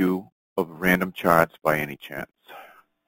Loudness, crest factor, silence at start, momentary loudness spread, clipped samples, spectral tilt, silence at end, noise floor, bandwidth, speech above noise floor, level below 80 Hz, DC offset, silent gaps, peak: -23 LUFS; 22 dB; 0 s; 16 LU; under 0.1%; -6 dB/octave; 0.4 s; -49 dBFS; 17 kHz; 26 dB; -54 dBFS; under 0.1%; 0.32-0.56 s; -2 dBFS